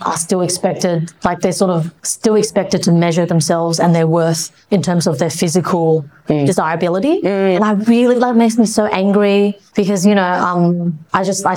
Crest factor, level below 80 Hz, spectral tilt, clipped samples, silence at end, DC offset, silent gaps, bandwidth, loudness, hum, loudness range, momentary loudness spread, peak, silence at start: 12 dB; -52 dBFS; -5.5 dB/octave; under 0.1%; 0 s; under 0.1%; none; 17 kHz; -14 LUFS; none; 2 LU; 6 LU; -2 dBFS; 0 s